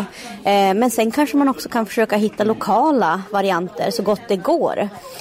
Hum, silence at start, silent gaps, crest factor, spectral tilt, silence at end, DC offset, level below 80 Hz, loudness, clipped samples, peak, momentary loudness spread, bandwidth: none; 0 s; none; 12 dB; -5 dB/octave; 0 s; under 0.1%; -58 dBFS; -18 LUFS; under 0.1%; -6 dBFS; 6 LU; 16 kHz